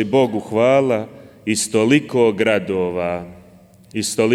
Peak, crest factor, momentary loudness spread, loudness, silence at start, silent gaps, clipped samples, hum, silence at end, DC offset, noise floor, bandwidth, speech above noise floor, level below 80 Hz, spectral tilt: -4 dBFS; 14 dB; 14 LU; -18 LUFS; 0 s; none; under 0.1%; none; 0 s; under 0.1%; -47 dBFS; 16 kHz; 30 dB; -56 dBFS; -4.5 dB/octave